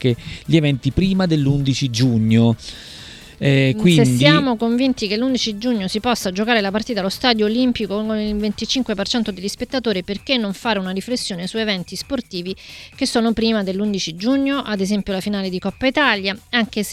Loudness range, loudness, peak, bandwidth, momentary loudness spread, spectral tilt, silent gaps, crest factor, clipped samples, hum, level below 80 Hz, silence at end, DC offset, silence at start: 5 LU; -19 LUFS; 0 dBFS; 15 kHz; 10 LU; -5.5 dB/octave; none; 18 dB; under 0.1%; none; -42 dBFS; 0 s; under 0.1%; 0 s